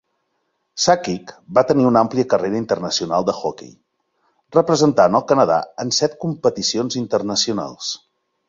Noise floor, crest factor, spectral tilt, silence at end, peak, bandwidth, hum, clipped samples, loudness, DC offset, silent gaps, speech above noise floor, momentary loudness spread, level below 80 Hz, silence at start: -71 dBFS; 18 dB; -4.5 dB/octave; 0.55 s; -2 dBFS; 7.8 kHz; none; under 0.1%; -18 LUFS; under 0.1%; none; 53 dB; 12 LU; -58 dBFS; 0.75 s